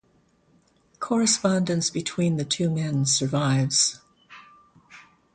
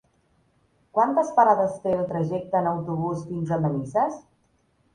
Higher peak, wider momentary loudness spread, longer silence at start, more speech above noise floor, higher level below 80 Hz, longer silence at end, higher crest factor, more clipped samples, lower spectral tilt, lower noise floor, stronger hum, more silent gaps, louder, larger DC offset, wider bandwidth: about the same, -8 dBFS vs -6 dBFS; second, 6 LU vs 9 LU; about the same, 1 s vs 0.95 s; about the same, 40 dB vs 43 dB; about the same, -62 dBFS vs -60 dBFS; second, 0.35 s vs 0.75 s; about the same, 18 dB vs 18 dB; neither; second, -4 dB/octave vs -8.5 dB/octave; about the same, -63 dBFS vs -66 dBFS; neither; neither; about the same, -23 LUFS vs -24 LUFS; neither; about the same, 9.6 kHz vs 10 kHz